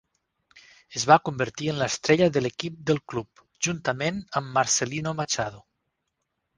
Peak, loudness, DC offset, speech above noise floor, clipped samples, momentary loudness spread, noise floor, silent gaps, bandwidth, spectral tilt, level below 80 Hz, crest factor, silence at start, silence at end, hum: 0 dBFS; -25 LUFS; under 0.1%; 54 dB; under 0.1%; 11 LU; -79 dBFS; none; 10.5 kHz; -4 dB/octave; -60 dBFS; 26 dB; 0.55 s; 1 s; none